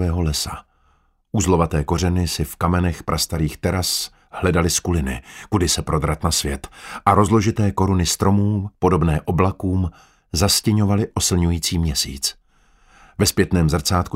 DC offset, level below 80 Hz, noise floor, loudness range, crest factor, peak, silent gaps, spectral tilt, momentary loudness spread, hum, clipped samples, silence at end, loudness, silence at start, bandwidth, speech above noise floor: under 0.1%; -32 dBFS; -60 dBFS; 2 LU; 20 dB; 0 dBFS; none; -4.5 dB/octave; 7 LU; none; under 0.1%; 0.05 s; -20 LUFS; 0 s; 16 kHz; 41 dB